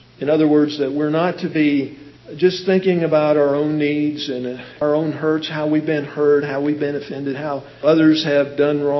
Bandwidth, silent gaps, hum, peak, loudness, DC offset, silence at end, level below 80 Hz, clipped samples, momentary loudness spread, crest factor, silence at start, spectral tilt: 6 kHz; none; none; -2 dBFS; -18 LUFS; under 0.1%; 0 s; -62 dBFS; under 0.1%; 10 LU; 16 dB; 0.2 s; -7 dB/octave